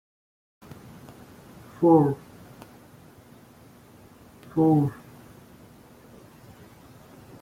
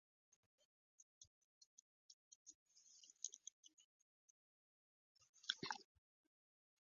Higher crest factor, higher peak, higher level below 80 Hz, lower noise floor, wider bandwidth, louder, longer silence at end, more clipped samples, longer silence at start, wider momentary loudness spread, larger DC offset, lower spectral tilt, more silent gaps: second, 22 dB vs 38 dB; first, -6 dBFS vs -22 dBFS; first, -62 dBFS vs under -90 dBFS; second, -52 dBFS vs under -90 dBFS; first, 16 kHz vs 7.2 kHz; first, -23 LUFS vs -51 LUFS; first, 2.5 s vs 1.05 s; neither; first, 1.8 s vs 1 s; first, 29 LU vs 22 LU; neither; first, -9.5 dB/octave vs 0.5 dB/octave; second, none vs 1.02-1.21 s, 1.27-1.61 s, 1.67-2.45 s, 2.55-2.66 s, 3.52-3.63 s, 3.73-3.77 s, 3.84-5.15 s, 5.29-5.33 s